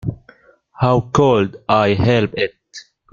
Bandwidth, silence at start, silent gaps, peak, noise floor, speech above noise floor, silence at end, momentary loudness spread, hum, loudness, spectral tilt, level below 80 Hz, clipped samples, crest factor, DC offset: 7.4 kHz; 0.05 s; none; 0 dBFS; -50 dBFS; 35 dB; 0.3 s; 20 LU; none; -16 LUFS; -7 dB/octave; -44 dBFS; under 0.1%; 18 dB; under 0.1%